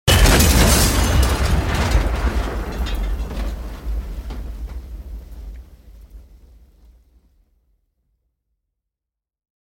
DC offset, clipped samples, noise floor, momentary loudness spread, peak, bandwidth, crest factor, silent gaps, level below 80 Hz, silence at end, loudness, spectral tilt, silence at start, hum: under 0.1%; under 0.1%; -86 dBFS; 23 LU; -2 dBFS; 17 kHz; 18 dB; none; -22 dBFS; 3.5 s; -18 LUFS; -4 dB/octave; 0.05 s; none